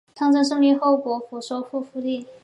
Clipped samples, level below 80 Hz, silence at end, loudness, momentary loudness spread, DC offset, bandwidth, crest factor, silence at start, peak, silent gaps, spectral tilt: under 0.1%; -78 dBFS; 0.1 s; -22 LUFS; 12 LU; under 0.1%; 11 kHz; 14 dB; 0.15 s; -8 dBFS; none; -4 dB/octave